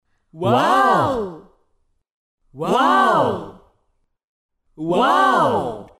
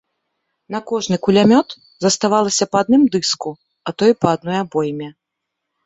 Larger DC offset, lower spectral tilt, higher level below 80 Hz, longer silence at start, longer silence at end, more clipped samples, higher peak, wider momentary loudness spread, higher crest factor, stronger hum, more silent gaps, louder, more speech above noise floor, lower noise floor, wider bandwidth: neither; about the same, -5.5 dB/octave vs -4.5 dB/octave; about the same, -54 dBFS vs -56 dBFS; second, 0.35 s vs 0.7 s; second, 0.15 s vs 0.75 s; neither; second, -4 dBFS vs 0 dBFS; second, 13 LU vs 16 LU; about the same, 16 dB vs 18 dB; neither; first, 2.11-2.38 s, 4.24-4.49 s vs none; about the same, -17 LUFS vs -16 LUFS; second, 51 dB vs 63 dB; second, -68 dBFS vs -79 dBFS; first, 15.5 kHz vs 8.4 kHz